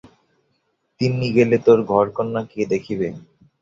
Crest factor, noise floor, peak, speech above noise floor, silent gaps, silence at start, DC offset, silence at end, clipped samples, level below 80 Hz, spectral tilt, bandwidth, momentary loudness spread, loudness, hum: 18 dB; -69 dBFS; -2 dBFS; 51 dB; none; 1 s; under 0.1%; 0.4 s; under 0.1%; -56 dBFS; -7.5 dB/octave; 7.6 kHz; 11 LU; -19 LUFS; none